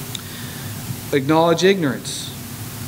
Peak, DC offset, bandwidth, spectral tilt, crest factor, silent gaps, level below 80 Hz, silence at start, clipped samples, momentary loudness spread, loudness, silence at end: -2 dBFS; under 0.1%; 16 kHz; -5 dB/octave; 18 dB; none; -52 dBFS; 0 s; under 0.1%; 15 LU; -20 LUFS; 0 s